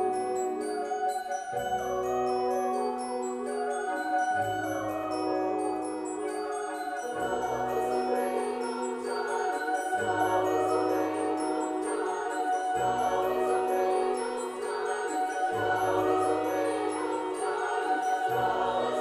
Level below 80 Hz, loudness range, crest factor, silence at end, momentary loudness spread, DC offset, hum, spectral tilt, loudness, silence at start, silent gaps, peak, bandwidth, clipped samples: -64 dBFS; 3 LU; 14 dB; 0 s; 6 LU; under 0.1%; none; -4 dB/octave; -30 LUFS; 0 s; none; -16 dBFS; 15 kHz; under 0.1%